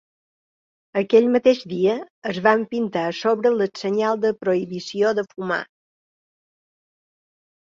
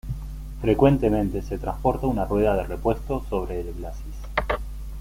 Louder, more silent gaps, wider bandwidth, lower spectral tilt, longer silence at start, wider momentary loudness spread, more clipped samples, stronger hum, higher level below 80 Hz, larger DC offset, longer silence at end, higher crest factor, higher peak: first, -21 LUFS vs -25 LUFS; first, 2.10-2.22 s vs none; second, 7.4 kHz vs 16.5 kHz; second, -6 dB/octave vs -8 dB/octave; first, 0.95 s vs 0.05 s; second, 10 LU vs 16 LU; neither; neither; second, -66 dBFS vs -32 dBFS; neither; first, 2.15 s vs 0 s; about the same, 20 dB vs 20 dB; about the same, -2 dBFS vs -4 dBFS